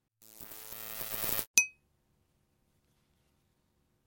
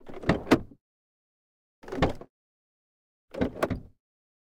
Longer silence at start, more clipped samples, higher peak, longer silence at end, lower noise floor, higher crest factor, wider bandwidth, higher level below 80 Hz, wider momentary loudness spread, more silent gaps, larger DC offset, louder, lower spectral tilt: first, 0.2 s vs 0.05 s; neither; first, -2 dBFS vs -6 dBFS; first, 2.35 s vs 0.65 s; second, -75 dBFS vs under -90 dBFS; first, 36 dB vs 28 dB; about the same, 17 kHz vs 17 kHz; second, -68 dBFS vs -46 dBFS; first, 19 LU vs 15 LU; second, 1.47-1.54 s vs 0.81-1.82 s, 2.30-3.28 s; neither; about the same, -31 LUFS vs -29 LUFS; second, 0.5 dB/octave vs -6.5 dB/octave